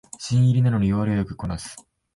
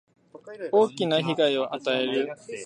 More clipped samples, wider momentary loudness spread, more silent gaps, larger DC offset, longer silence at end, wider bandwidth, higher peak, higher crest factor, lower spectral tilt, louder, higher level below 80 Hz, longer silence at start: neither; first, 13 LU vs 10 LU; neither; neither; first, 0.35 s vs 0 s; about the same, 11.5 kHz vs 10.5 kHz; about the same, -10 dBFS vs -8 dBFS; second, 12 dB vs 18 dB; first, -7 dB/octave vs -5 dB/octave; first, -22 LUFS vs -25 LUFS; first, -44 dBFS vs -78 dBFS; second, 0.2 s vs 0.35 s